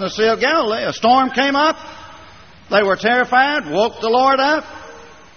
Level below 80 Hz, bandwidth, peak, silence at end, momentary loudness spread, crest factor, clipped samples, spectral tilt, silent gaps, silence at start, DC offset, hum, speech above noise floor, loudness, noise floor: -52 dBFS; 6.6 kHz; -2 dBFS; 0.3 s; 7 LU; 16 dB; under 0.1%; -1 dB/octave; none; 0 s; 0.2%; none; 27 dB; -16 LUFS; -42 dBFS